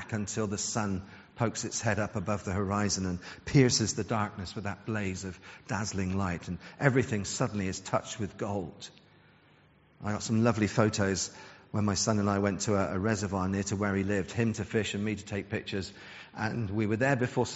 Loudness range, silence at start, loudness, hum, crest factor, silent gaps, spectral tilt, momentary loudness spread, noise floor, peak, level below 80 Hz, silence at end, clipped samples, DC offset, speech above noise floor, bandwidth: 3 LU; 0 s; -31 LUFS; none; 24 dB; none; -5.5 dB/octave; 10 LU; -62 dBFS; -6 dBFS; -58 dBFS; 0 s; under 0.1%; under 0.1%; 31 dB; 8 kHz